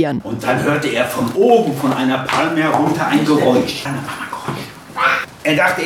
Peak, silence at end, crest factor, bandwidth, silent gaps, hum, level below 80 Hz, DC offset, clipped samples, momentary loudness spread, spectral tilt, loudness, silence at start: 0 dBFS; 0 s; 16 dB; 17 kHz; none; none; -52 dBFS; under 0.1%; under 0.1%; 12 LU; -5 dB/octave; -16 LUFS; 0 s